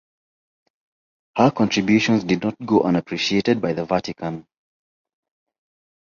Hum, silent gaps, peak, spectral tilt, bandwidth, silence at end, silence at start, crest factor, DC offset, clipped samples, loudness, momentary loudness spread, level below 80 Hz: none; none; -2 dBFS; -5.5 dB/octave; 7.4 kHz; 1.7 s; 1.35 s; 20 dB; under 0.1%; under 0.1%; -20 LUFS; 12 LU; -56 dBFS